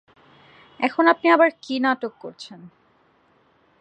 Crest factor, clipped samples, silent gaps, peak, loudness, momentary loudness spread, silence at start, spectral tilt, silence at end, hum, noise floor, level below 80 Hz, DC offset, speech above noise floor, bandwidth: 20 dB; under 0.1%; none; -4 dBFS; -20 LUFS; 22 LU; 0.8 s; -4.5 dB/octave; 1.15 s; none; -61 dBFS; -76 dBFS; under 0.1%; 40 dB; 9 kHz